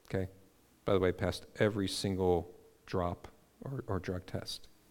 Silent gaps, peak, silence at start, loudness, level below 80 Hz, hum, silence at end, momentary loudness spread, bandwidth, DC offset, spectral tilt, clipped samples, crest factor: none; -14 dBFS; 0.1 s; -35 LUFS; -58 dBFS; none; 0.2 s; 13 LU; 17.5 kHz; under 0.1%; -6 dB/octave; under 0.1%; 22 dB